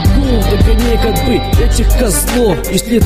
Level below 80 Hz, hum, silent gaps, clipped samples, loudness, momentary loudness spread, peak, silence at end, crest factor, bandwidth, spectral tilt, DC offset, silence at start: -14 dBFS; none; none; under 0.1%; -12 LUFS; 2 LU; 0 dBFS; 0 s; 10 dB; 15.5 kHz; -5 dB/octave; under 0.1%; 0 s